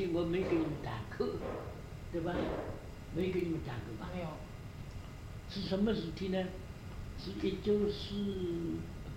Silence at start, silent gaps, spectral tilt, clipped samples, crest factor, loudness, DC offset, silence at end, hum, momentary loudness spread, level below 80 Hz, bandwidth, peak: 0 s; none; -7 dB/octave; under 0.1%; 16 dB; -38 LUFS; under 0.1%; 0 s; none; 14 LU; -50 dBFS; 16 kHz; -20 dBFS